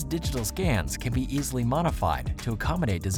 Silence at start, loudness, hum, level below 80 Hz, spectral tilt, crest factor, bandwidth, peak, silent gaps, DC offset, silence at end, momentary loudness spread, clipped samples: 0 s; -28 LUFS; none; -36 dBFS; -5.5 dB/octave; 14 dB; 20 kHz; -12 dBFS; none; under 0.1%; 0 s; 4 LU; under 0.1%